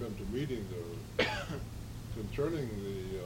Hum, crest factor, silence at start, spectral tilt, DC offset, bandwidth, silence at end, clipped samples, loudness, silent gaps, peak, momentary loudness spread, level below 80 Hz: none; 22 dB; 0 s; -5.5 dB/octave; under 0.1%; 16.5 kHz; 0 s; under 0.1%; -38 LUFS; none; -14 dBFS; 9 LU; -48 dBFS